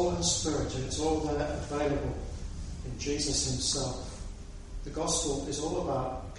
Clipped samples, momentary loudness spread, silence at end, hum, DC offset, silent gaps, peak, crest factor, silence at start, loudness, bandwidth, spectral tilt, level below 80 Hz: under 0.1%; 13 LU; 0 s; none; under 0.1%; none; -14 dBFS; 18 dB; 0 s; -32 LUFS; 11.5 kHz; -4 dB/octave; -42 dBFS